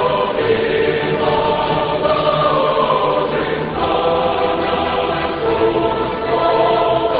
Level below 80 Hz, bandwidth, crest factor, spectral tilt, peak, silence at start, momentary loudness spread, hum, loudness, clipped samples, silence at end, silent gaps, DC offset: -40 dBFS; 5 kHz; 14 dB; -11 dB/octave; -2 dBFS; 0 s; 4 LU; none; -16 LUFS; under 0.1%; 0 s; none; 0.1%